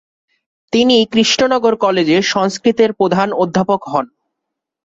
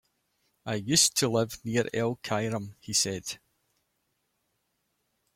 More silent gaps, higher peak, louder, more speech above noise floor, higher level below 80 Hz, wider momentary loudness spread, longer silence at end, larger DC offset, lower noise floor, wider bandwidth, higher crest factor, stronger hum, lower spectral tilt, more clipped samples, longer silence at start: neither; first, 0 dBFS vs -8 dBFS; first, -14 LUFS vs -27 LUFS; first, 65 dB vs 49 dB; first, -54 dBFS vs -66 dBFS; second, 6 LU vs 14 LU; second, 0.8 s vs 2 s; neither; about the same, -79 dBFS vs -77 dBFS; second, 7.8 kHz vs 16.5 kHz; second, 14 dB vs 22 dB; neither; first, -4.5 dB/octave vs -3 dB/octave; neither; about the same, 0.7 s vs 0.65 s